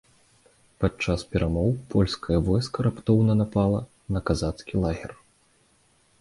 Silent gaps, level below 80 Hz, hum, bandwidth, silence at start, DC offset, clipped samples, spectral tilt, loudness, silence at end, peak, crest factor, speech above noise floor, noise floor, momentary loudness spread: none; -40 dBFS; none; 11.5 kHz; 0.8 s; under 0.1%; under 0.1%; -7.5 dB/octave; -25 LUFS; 1.05 s; -6 dBFS; 18 dB; 39 dB; -63 dBFS; 8 LU